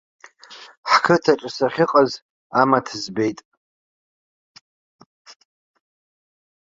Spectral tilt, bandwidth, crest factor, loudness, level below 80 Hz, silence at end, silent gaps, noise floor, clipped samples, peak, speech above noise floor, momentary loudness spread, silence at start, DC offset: -5 dB/octave; 7.8 kHz; 22 dB; -19 LUFS; -66 dBFS; 3.35 s; 0.77-0.83 s, 2.22-2.50 s; -44 dBFS; under 0.1%; 0 dBFS; 25 dB; 18 LU; 0.5 s; under 0.1%